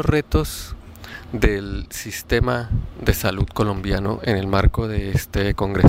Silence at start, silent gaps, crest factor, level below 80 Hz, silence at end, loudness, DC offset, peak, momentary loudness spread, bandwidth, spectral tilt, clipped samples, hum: 0 s; none; 18 dB; -28 dBFS; 0 s; -22 LUFS; under 0.1%; -2 dBFS; 11 LU; 16 kHz; -6 dB/octave; under 0.1%; none